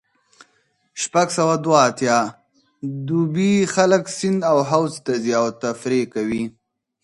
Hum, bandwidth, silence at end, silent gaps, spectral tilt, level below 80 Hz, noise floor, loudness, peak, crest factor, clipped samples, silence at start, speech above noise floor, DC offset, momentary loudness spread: none; 11.5 kHz; 0.55 s; none; -5 dB/octave; -62 dBFS; -64 dBFS; -19 LUFS; 0 dBFS; 20 dB; under 0.1%; 0.95 s; 46 dB; under 0.1%; 12 LU